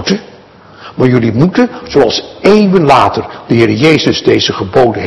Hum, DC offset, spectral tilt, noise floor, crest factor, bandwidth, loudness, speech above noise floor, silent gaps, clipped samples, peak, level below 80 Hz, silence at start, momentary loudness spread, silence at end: none; under 0.1%; -6 dB/octave; -37 dBFS; 10 dB; 12 kHz; -10 LUFS; 27 dB; none; 3%; 0 dBFS; -40 dBFS; 0 s; 7 LU; 0 s